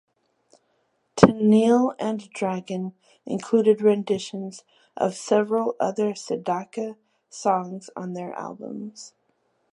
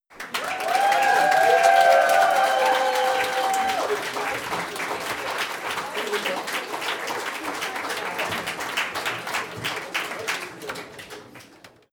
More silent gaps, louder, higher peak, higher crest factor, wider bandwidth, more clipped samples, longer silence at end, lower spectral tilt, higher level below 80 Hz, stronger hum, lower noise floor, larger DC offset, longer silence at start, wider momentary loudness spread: neither; about the same, -23 LUFS vs -23 LUFS; first, 0 dBFS vs -4 dBFS; first, 24 dB vs 18 dB; second, 11 kHz vs 19.5 kHz; neither; first, 0.65 s vs 0.25 s; first, -6.5 dB/octave vs -1.5 dB/octave; first, -58 dBFS vs -66 dBFS; neither; first, -70 dBFS vs -50 dBFS; neither; first, 1.15 s vs 0.1 s; first, 18 LU vs 12 LU